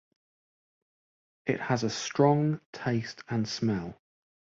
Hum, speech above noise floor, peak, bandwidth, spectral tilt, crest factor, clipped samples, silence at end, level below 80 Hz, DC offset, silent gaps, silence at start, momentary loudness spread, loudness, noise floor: none; over 61 dB; -10 dBFS; 7.8 kHz; -6 dB/octave; 20 dB; under 0.1%; 0.65 s; -64 dBFS; under 0.1%; 2.65-2.73 s; 1.45 s; 10 LU; -29 LUFS; under -90 dBFS